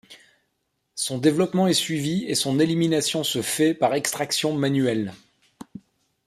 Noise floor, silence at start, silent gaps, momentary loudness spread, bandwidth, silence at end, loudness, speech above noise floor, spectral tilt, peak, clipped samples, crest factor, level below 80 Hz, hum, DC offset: -75 dBFS; 0.1 s; none; 10 LU; 15.5 kHz; 0.5 s; -22 LUFS; 52 dB; -4.5 dB/octave; -6 dBFS; under 0.1%; 18 dB; -64 dBFS; none; under 0.1%